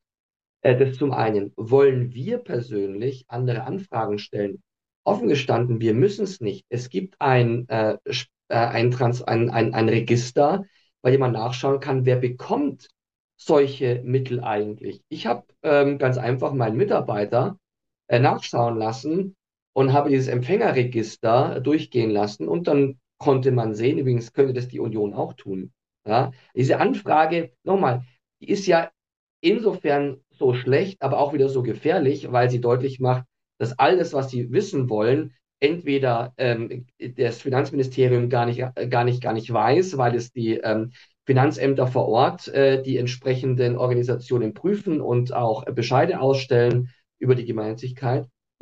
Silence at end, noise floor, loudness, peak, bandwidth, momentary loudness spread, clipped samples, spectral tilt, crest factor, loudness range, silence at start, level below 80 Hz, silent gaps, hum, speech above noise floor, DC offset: 0.35 s; -53 dBFS; -22 LUFS; -2 dBFS; 7.8 kHz; 9 LU; under 0.1%; -7 dB/octave; 20 dB; 2 LU; 0.65 s; -66 dBFS; 4.96-5.04 s, 13.20-13.29 s, 19.62-19.73 s, 29.17-29.43 s; none; 32 dB; under 0.1%